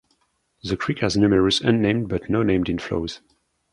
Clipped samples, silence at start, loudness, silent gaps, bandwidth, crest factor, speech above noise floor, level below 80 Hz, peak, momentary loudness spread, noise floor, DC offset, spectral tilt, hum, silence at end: under 0.1%; 0.65 s; -21 LUFS; none; 11 kHz; 18 dB; 48 dB; -44 dBFS; -4 dBFS; 12 LU; -68 dBFS; under 0.1%; -6 dB/octave; none; 0.55 s